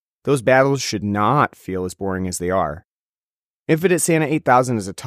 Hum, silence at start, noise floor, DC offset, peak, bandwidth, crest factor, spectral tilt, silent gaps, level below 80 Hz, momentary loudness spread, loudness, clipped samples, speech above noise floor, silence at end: none; 0.25 s; under -90 dBFS; under 0.1%; -2 dBFS; 15.5 kHz; 18 dB; -5 dB/octave; 2.84-3.66 s; -52 dBFS; 11 LU; -19 LUFS; under 0.1%; over 72 dB; 0 s